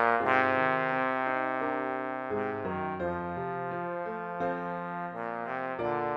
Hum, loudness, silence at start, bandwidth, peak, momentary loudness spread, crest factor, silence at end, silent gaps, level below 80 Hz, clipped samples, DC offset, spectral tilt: none; -31 LUFS; 0 s; 9.2 kHz; -10 dBFS; 10 LU; 22 dB; 0 s; none; -68 dBFS; under 0.1%; under 0.1%; -7.5 dB/octave